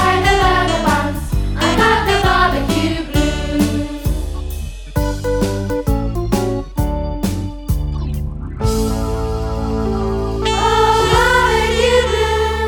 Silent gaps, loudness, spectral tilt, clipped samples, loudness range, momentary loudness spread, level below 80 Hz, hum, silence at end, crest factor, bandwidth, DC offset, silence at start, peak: none; -17 LUFS; -5 dB/octave; under 0.1%; 6 LU; 9 LU; -22 dBFS; none; 0 s; 16 dB; 19.5 kHz; under 0.1%; 0 s; 0 dBFS